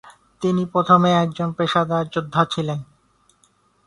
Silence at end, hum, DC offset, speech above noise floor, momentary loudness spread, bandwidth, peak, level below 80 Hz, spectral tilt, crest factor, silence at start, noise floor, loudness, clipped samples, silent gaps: 1.05 s; none; under 0.1%; 42 dB; 11 LU; 11 kHz; -2 dBFS; -58 dBFS; -6.5 dB/octave; 20 dB; 0.05 s; -61 dBFS; -20 LUFS; under 0.1%; none